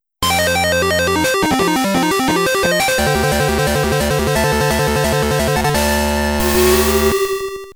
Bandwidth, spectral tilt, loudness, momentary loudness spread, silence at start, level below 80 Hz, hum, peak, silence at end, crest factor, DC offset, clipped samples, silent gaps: over 20 kHz; -4 dB/octave; -15 LUFS; 3 LU; 0.2 s; -28 dBFS; none; -2 dBFS; 0.05 s; 14 dB; under 0.1%; under 0.1%; none